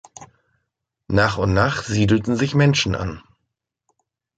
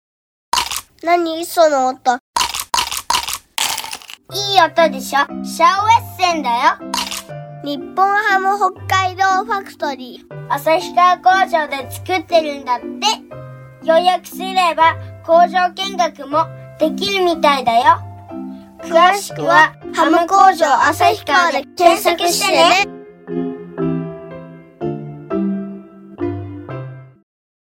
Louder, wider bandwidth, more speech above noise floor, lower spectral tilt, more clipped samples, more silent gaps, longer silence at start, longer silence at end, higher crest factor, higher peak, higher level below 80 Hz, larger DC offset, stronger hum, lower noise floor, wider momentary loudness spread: second, -19 LUFS vs -15 LUFS; second, 9.2 kHz vs 20 kHz; first, 59 dB vs 20 dB; first, -5.5 dB/octave vs -3 dB/octave; neither; second, none vs 2.20-2.34 s; second, 0.2 s vs 0.55 s; first, 1.2 s vs 0.7 s; about the same, 18 dB vs 16 dB; second, -4 dBFS vs 0 dBFS; first, -40 dBFS vs -54 dBFS; neither; neither; first, -78 dBFS vs -35 dBFS; second, 9 LU vs 17 LU